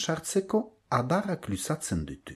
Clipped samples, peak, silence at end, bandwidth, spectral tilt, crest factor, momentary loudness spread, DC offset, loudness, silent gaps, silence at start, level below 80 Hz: under 0.1%; -12 dBFS; 0 s; 14 kHz; -5 dB/octave; 18 dB; 6 LU; under 0.1%; -30 LUFS; none; 0 s; -52 dBFS